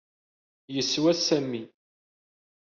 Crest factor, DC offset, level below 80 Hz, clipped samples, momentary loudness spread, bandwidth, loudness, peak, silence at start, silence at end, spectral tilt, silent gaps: 20 dB; under 0.1%; -72 dBFS; under 0.1%; 12 LU; 7.2 kHz; -26 LUFS; -10 dBFS; 0.7 s; 1 s; -4 dB/octave; none